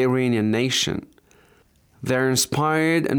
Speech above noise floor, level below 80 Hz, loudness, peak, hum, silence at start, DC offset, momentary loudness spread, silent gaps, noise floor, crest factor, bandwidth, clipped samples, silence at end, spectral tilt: 37 dB; -58 dBFS; -21 LUFS; -8 dBFS; none; 0 s; under 0.1%; 6 LU; none; -58 dBFS; 14 dB; over 20 kHz; under 0.1%; 0 s; -4 dB/octave